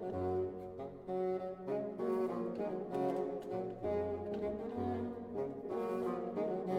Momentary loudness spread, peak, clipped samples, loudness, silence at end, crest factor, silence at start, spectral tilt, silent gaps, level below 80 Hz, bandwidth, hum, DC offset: 5 LU; -24 dBFS; under 0.1%; -39 LUFS; 0 s; 14 dB; 0 s; -8.5 dB/octave; none; -66 dBFS; 12 kHz; none; under 0.1%